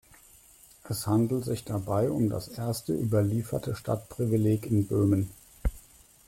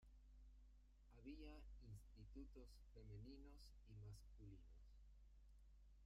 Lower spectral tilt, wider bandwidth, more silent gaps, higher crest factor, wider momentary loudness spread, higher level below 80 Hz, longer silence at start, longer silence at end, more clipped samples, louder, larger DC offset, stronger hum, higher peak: about the same, -7.5 dB/octave vs -6.5 dB/octave; first, 16.5 kHz vs 14 kHz; neither; about the same, 14 dB vs 14 dB; first, 11 LU vs 6 LU; first, -44 dBFS vs -66 dBFS; first, 0.85 s vs 0 s; first, 0.5 s vs 0 s; neither; first, -29 LUFS vs -64 LUFS; neither; neither; first, -14 dBFS vs -48 dBFS